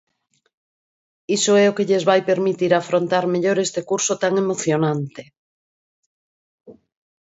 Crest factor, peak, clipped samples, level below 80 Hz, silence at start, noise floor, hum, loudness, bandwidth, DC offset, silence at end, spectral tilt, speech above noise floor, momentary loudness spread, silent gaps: 18 dB; -2 dBFS; under 0.1%; -68 dBFS; 1.3 s; under -90 dBFS; none; -19 LUFS; 8 kHz; under 0.1%; 0.5 s; -4.5 dB/octave; over 71 dB; 6 LU; 5.38-6.58 s